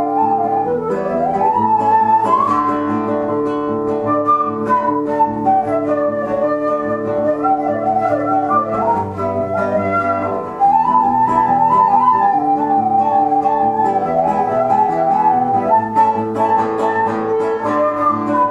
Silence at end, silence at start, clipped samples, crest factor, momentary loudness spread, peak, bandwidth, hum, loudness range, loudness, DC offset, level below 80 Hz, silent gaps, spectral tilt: 0 s; 0 s; under 0.1%; 14 dB; 5 LU; -2 dBFS; 10.5 kHz; none; 3 LU; -15 LUFS; under 0.1%; -50 dBFS; none; -8 dB/octave